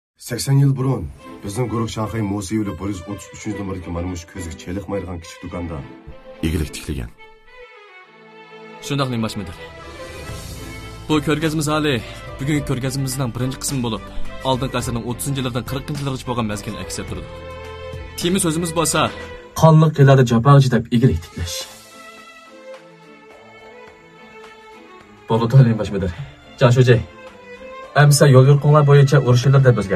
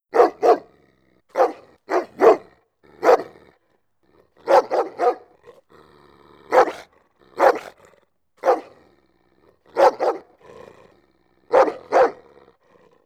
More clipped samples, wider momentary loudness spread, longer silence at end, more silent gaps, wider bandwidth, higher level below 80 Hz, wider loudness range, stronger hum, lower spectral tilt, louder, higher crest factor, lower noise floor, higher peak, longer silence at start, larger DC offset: neither; first, 22 LU vs 14 LU; second, 0 s vs 0.95 s; neither; about the same, 14.5 kHz vs 14 kHz; first, -40 dBFS vs -66 dBFS; first, 14 LU vs 4 LU; neither; first, -6 dB/octave vs -4 dB/octave; about the same, -18 LUFS vs -19 LUFS; about the same, 18 dB vs 20 dB; second, -44 dBFS vs -67 dBFS; about the same, 0 dBFS vs -2 dBFS; about the same, 0.2 s vs 0.15 s; neither